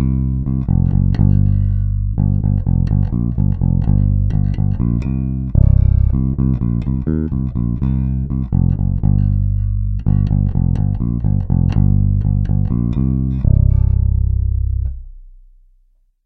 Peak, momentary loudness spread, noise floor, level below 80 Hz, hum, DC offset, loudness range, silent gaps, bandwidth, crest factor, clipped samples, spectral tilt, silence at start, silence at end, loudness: 0 dBFS; 6 LU; -55 dBFS; -20 dBFS; none; under 0.1%; 2 LU; none; 2.9 kHz; 14 dB; under 0.1%; -12 dB/octave; 0 s; 0.95 s; -17 LUFS